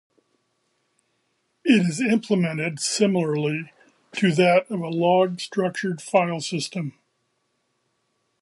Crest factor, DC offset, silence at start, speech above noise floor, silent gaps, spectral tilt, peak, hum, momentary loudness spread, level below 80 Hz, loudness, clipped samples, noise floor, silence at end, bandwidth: 20 dB; under 0.1%; 1.65 s; 51 dB; none; -5 dB/octave; -4 dBFS; none; 10 LU; -74 dBFS; -22 LUFS; under 0.1%; -72 dBFS; 1.5 s; 11.5 kHz